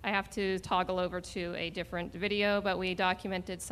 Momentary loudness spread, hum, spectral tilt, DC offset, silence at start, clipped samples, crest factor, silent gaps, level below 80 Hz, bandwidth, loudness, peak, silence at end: 8 LU; none; -4.5 dB/octave; under 0.1%; 0 s; under 0.1%; 18 dB; none; -54 dBFS; 15 kHz; -33 LUFS; -14 dBFS; 0 s